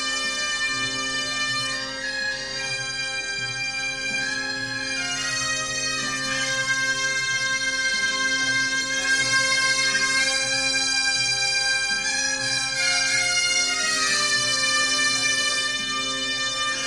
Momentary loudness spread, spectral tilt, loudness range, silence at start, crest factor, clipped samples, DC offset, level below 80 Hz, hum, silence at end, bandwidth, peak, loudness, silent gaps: 7 LU; 0 dB/octave; 5 LU; 0 s; 16 dB; under 0.1%; under 0.1%; -54 dBFS; none; 0 s; 12 kHz; -8 dBFS; -21 LUFS; none